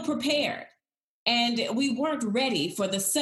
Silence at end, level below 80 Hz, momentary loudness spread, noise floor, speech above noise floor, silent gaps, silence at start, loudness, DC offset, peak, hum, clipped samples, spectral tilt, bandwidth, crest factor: 0 s; -74 dBFS; 5 LU; -76 dBFS; 49 dB; 1.04-1.26 s; 0 s; -26 LUFS; under 0.1%; -8 dBFS; none; under 0.1%; -2.5 dB/octave; 13.5 kHz; 20 dB